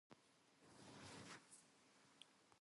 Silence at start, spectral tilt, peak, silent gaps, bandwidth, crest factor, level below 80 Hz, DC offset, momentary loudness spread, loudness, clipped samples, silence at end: 0.1 s; -3 dB/octave; -44 dBFS; none; 11.5 kHz; 22 dB; -88 dBFS; under 0.1%; 9 LU; -62 LUFS; under 0.1%; 0 s